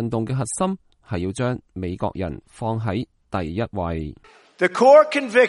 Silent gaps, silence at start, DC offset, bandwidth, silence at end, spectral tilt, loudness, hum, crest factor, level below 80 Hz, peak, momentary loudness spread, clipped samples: none; 0 s; under 0.1%; 11.5 kHz; 0 s; -6 dB/octave; -22 LUFS; none; 20 dB; -46 dBFS; -2 dBFS; 17 LU; under 0.1%